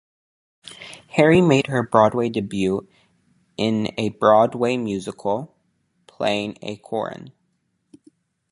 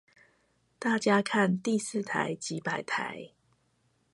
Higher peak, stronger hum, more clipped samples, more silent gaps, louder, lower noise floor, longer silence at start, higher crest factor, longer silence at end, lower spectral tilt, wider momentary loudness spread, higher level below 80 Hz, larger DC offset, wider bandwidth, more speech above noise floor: first, 0 dBFS vs -12 dBFS; neither; neither; neither; first, -20 LUFS vs -30 LUFS; about the same, -70 dBFS vs -72 dBFS; second, 0.65 s vs 0.8 s; about the same, 22 dB vs 20 dB; first, 1.25 s vs 0.85 s; first, -6.5 dB/octave vs -4.5 dB/octave; first, 22 LU vs 9 LU; first, -56 dBFS vs -76 dBFS; neither; about the same, 11.5 kHz vs 11.5 kHz; first, 50 dB vs 42 dB